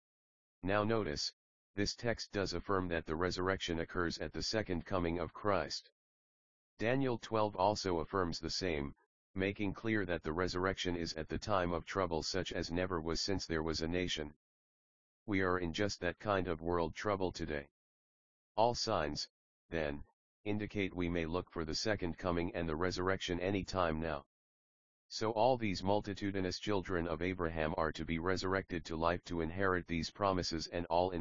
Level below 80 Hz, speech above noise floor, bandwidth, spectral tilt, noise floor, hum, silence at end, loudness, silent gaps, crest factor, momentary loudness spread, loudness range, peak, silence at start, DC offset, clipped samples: -56 dBFS; over 53 dB; 7.4 kHz; -4 dB/octave; under -90 dBFS; none; 0 s; -37 LUFS; 1.33-1.74 s, 5.92-6.77 s, 9.06-9.34 s, 14.36-15.26 s, 17.71-18.55 s, 19.30-19.69 s, 20.13-20.44 s, 24.26-25.09 s; 20 dB; 6 LU; 2 LU; -16 dBFS; 0.6 s; 0.2%; under 0.1%